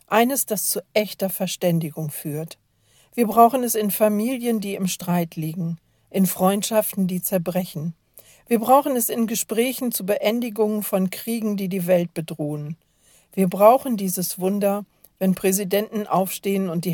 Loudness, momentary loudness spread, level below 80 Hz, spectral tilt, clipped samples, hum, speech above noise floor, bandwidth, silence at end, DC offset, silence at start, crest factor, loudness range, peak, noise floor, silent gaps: -22 LUFS; 12 LU; -66 dBFS; -5 dB/octave; under 0.1%; none; 38 dB; 17.5 kHz; 0 s; under 0.1%; 0.1 s; 22 dB; 3 LU; 0 dBFS; -59 dBFS; none